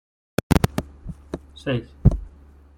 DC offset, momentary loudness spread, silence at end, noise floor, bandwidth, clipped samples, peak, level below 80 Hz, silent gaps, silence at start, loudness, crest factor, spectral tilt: under 0.1%; 16 LU; 0.5 s; -48 dBFS; 16.5 kHz; under 0.1%; -2 dBFS; -32 dBFS; none; 0.5 s; -24 LUFS; 22 dB; -7 dB/octave